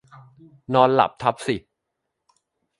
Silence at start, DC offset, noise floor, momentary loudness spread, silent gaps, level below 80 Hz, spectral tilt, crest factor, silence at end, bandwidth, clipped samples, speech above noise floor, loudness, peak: 0.7 s; under 0.1%; -80 dBFS; 11 LU; none; -60 dBFS; -6 dB/octave; 24 dB; 1.2 s; 11.5 kHz; under 0.1%; 59 dB; -21 LUFS; 0 dBFS